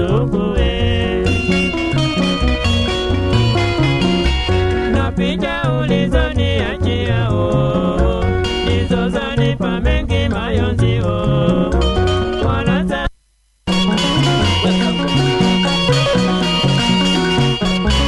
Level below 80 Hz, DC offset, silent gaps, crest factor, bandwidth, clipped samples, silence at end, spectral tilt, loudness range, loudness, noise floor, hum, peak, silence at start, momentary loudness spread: -24 dBFS; under 0.1%; none; 14 dB; 11.5 kHz; under 0.1%; 0 s; -6 dB/octave; 2 LU; -16 LUFS; -57 dBFS; none; 0 dBFS; 0 s; 4 LU